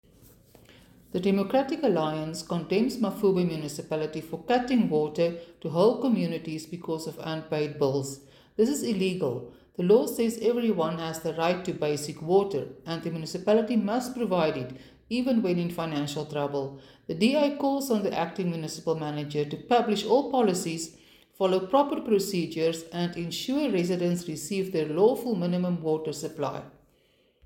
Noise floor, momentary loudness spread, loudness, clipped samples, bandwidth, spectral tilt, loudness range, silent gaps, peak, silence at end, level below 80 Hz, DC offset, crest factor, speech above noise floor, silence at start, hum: -66 dBFS; 10 LU; -27 LUFS; under 0.1%; 17 kHz; -6 dB/octave; 2 LU; none; -8 dBFS; 0.75 s; -64 dBFS; under 0.1%; 18 dB; 39 dB; 1.15 s; none